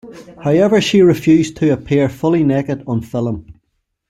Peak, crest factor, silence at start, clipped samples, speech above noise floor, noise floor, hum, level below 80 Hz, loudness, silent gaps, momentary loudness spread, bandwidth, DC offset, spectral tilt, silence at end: -2 dBFS; 14 dB; 0.05 s; under 0.1%; 55 dB; -69 dBFS; none; -46 dBFS; -15 LUFS; none; 10 LU; 14 kHz; under 0.1%; -6.5 dB/octave; 0.55 s